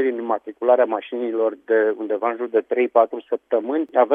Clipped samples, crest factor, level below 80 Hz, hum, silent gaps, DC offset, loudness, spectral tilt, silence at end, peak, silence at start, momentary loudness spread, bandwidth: under 0.1%; 18 dB; -80 dBFS; none; none; under 0.1%; -21 LUFS; -7.5 dB/octave; 0 s; -2 dBFS; 0 s; 7 LU; 3.7 kHz